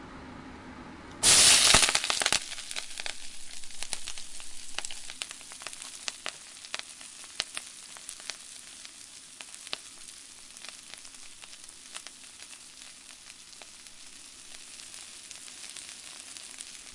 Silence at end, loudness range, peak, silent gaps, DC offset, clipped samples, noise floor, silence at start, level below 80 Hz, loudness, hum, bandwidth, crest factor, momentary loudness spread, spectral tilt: 0 s; 22 LU; -2 dBFS; none; under 0.1%; under 0.1%; -49 dBFS; 0 s; -54 dBFS; -26 LUFS; none; 11.5 kHz; 30 dB; 22 LU; 0.5 dB/octave